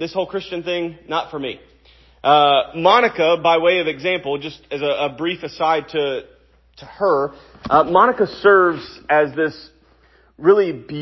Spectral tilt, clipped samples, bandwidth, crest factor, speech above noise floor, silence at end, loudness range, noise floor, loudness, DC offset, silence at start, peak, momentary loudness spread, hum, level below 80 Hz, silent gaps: -6 dB/octave; under 0.1%; 6 kHz; 18 dB; 36 dB; 0 s; 6 LU; -54 dBFS; -18 LUFS; under 0.1%; 0 s; 0 dBFS; 13 LU; none; -54 dBFS; none